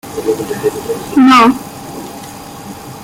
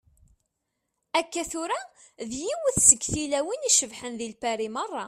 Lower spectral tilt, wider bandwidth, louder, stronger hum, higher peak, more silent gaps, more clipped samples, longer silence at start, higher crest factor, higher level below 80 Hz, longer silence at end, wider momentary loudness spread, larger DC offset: first, -4.5 dB/octave vs -1.5 dB/octave; first, 16.5 kHz vs 14 kHz; first, -11 LUFS vs -24 LUFS; neither; about the same, 0 dBFS vs -2 dBFS; neither; neither; second, 0.05 s vs 1.15 s; second, 14 dB vs 26 dB; first, -48 dBFS vs -54 dBFS; about the same, 0 s vs 0 s; first, 22 LU vs 17 LU; neither